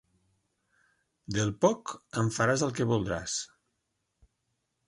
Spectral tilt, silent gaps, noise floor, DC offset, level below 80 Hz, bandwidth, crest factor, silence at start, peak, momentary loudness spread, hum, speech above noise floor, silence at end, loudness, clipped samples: -5 dB/octave; none; -80 dBFS; under 0.1%; -58 dBFS; 11.5 kHz; 22 dB; 1.3 s; -10 dBFS; 9 LU; none; 51 dB; 1.4 s; -30 LUFS; under 0.1%